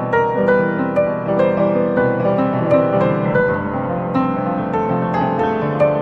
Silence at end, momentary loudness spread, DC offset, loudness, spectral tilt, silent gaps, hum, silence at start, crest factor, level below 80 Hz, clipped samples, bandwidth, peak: 0 s; 4 LU; under 0.1%; -17 LUFS; -9.5 dB/octave; none; none; 0 s; 14 dB; -46 dBFS; under 0.1%; 6.2 kHz; -2 dBFS